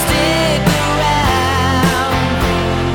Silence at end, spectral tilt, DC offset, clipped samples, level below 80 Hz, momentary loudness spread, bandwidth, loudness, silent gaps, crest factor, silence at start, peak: 0 s; -4.5 dB/octave; under 0.1%; under 0.1%; -26 dBFS; 2 LU; 19.5 kHz; -14 LUFS; none; 10 dB; 0 s; -4 dBFS